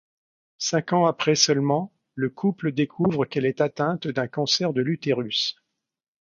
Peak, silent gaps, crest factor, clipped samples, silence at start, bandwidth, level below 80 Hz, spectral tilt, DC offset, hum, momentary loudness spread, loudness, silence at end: -4 dBFS; none; 20 dB; under 0.1%; 0.6 s; 7.4 kHz; -66 dBFS; -4.5 dB/octave; under 0.1%; none; 8 LU; -24 LUFS; 0.7 s